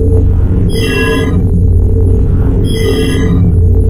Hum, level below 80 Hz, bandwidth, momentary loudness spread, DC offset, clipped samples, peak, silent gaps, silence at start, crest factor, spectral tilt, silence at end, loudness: none; -12 dBFS; 16 kHz; 2 LU; under 0.1%; under 0.1%; 0 dBFS; none; 0 s; 8 dB; -7 dB/octave; 0 s; -11 LUFS